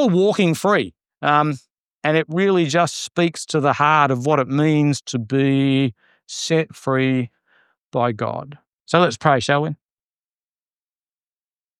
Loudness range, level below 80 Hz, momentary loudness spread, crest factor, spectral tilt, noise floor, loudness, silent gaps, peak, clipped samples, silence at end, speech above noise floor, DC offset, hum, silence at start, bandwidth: 4 LU; -66 dBFS; 10 LU; 18 dB; -5.5 dB/octave; under -90 dBFS; -19 LUFS; 1.80-1.87 s, 1.94-1.99 s, 7.85-7.91 s, 8.67-8.84 s; 0 dBFS; under 0.1%; 2.05 s; over 72 dB; under 0.1%; none; 0 s; 14 kHz